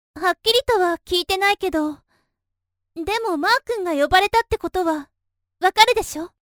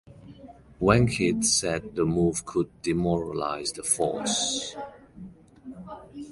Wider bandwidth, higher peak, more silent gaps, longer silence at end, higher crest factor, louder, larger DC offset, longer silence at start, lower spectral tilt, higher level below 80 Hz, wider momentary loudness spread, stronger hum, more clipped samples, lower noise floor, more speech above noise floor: first, over 20 kHz vs 11.5 kHz; first, 0 dBFS vs -6 dBFS; neither; first, 0.2 s vs 0 s; about the same, 20 dB vs 22 dB; first, -19 LUFS vs -25 LUFS; neither; about the same, 0.15 s vs 0.1 s; second, -2.5 dB/octave vs -4 dB/octave; about the same, -46 dBFS vs -48 dBFS; second, 10 LU vs 21 LU; neither; neither; first, -81 dBFS vs -48 dBFS; first, 61 dB vs 23 dB